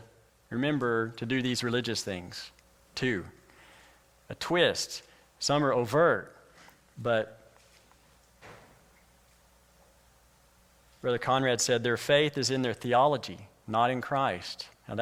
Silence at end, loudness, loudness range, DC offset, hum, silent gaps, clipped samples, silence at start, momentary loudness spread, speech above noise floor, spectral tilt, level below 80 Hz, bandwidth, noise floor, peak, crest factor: 0 s; -29 LUFS; 11 LU; under 0.1%; none; none; under 0.1%; 0 s; 17 LU; 34 dB; -4 dB/octave; -66 dBFS; 16.5 kHz; -62 dBFS; -10 dBFS; 20 dB